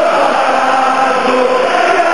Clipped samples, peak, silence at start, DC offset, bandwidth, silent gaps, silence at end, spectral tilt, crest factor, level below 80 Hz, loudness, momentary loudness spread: under 0.1%; 0 dBFS; 0 s; 2%; 12 kHz; none; 0 s; -3 dB/octave; 10 dB; -64 dBFS; -11 LUFS; 1 LU